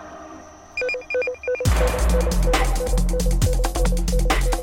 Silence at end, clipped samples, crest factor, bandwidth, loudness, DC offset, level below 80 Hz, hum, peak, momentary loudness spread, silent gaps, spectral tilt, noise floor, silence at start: 0 s; under 0.1%; 14 dB; 16.5 kHz; -22 LUFS; under 0.1%; -22 dBFS; none; -6 dBFS; 10 LU; none; -5 dB/octave; -41 dBFS; 0 s